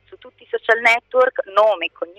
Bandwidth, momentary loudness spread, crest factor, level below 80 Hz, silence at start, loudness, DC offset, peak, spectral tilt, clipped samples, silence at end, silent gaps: 14.5 kHz; 10 LU; 16 dB; -66 dBFS; 0.25 s; -17 LUFS; under 0.1%; -2 dBFS; -1.5 dB/octave; under 0.1%; 0.15 s; none